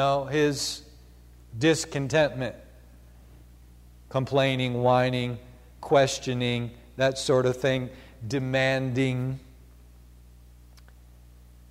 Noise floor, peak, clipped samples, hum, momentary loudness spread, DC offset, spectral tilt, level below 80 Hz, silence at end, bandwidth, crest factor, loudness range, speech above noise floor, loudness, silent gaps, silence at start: -51 dBFS; -8 dBFS; under 0.1%; 60 Hz at -50 dBFS; 16 LU; under 0.1%; -5 dB/octave; -52 dBFS; 2.25 s; 15.5 kHz; 18 dB; 5 LU; 26 dB; -26 LUFS; none; 0 s